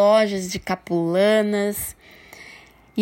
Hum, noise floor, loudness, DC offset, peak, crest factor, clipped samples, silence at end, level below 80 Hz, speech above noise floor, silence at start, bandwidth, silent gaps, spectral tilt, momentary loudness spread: none; -47 dBFS; -21 LUFS; under 0.1%; -6 dBFS; 16 dB; under 0.1%; 0 s; -54 dBFS; 27 dB; 0 s; 16.5 kHz; none; -5 dB/octave; 23 LU